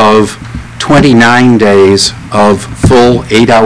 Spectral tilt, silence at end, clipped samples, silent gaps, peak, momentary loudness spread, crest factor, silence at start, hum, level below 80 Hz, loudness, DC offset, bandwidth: -5 dB/octave; 0 s; 6%; none; 0 dBFS; 10 LU; 6 dB; 0 s; none; -28 dBFS; -6 LUFS; 2%; 11 kHz